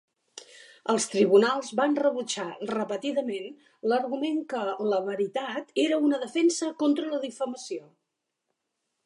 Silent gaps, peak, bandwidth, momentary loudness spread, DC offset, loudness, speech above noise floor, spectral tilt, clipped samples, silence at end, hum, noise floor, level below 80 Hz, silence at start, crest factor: none; -8 dBFS; 11.5 kHz; 13 LU; under 0.1%; -27 LUFS; 56 dB; -4 dB/octave; under 0.1%; 1.25 s; none; -82 dBFS; -82 dBFS; 0.35 s; 20 dB